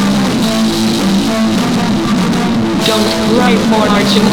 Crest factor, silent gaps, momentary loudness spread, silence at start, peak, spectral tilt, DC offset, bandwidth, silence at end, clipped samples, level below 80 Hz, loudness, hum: 12 dB; none; 3 LU; 0 s; 0 dBFS; -5 dB/octave; 2%; 19 kHz; 0 s; under 0.1%; -36 dBFS; -12 LUFS; none